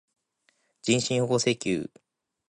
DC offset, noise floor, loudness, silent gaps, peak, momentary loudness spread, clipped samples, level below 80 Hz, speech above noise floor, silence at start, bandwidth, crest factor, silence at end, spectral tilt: under 0.1%; -71 dBFS; -26 LUFS; none; -10 dBFS; 10 LU; under 0.1%; -64 dBFS; 45 dB; 0.85 s; 11.5 kHz; 20 dB; 0.65 s; -4 dB/octave